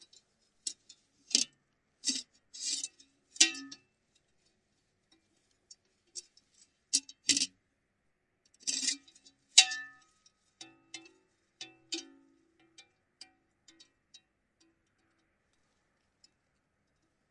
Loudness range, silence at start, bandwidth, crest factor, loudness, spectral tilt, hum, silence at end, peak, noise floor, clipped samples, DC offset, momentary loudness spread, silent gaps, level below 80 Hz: 19 LU; 0.65 s; 11.5 kHz; 36 dB; -30 LUFS; 2.5 dB/octave; none; 4.5 s; -4 dBFS; -79 dBFS; under 0.1%; under 0.1%; 25 LU; none; -86 dBFS